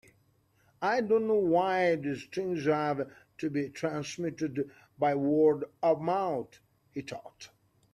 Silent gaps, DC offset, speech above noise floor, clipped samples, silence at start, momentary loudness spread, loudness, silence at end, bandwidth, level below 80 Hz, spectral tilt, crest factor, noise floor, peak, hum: none; under 0.1%; 39 dB; under 0.1%; 0.8 s; 15 LU; -30 LUFS; 0.45 s; 12.5 kHz; -72 dBFS; -6.5 dB/octave; 16 dB; -68 dBFS; -14 dBFS; none